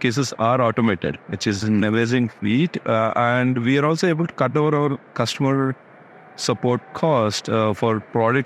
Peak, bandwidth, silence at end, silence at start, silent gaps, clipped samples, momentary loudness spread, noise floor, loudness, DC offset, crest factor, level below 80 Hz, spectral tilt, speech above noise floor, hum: -4 dBFS; 13.5 kHz; 0 s; 0 s; none; under 0.1%; 6 LU; -45 dBFS; -20 LUFS; under 0.1%; 16 dB; -60 dBFS; -6 dB/octave; 25 dB; none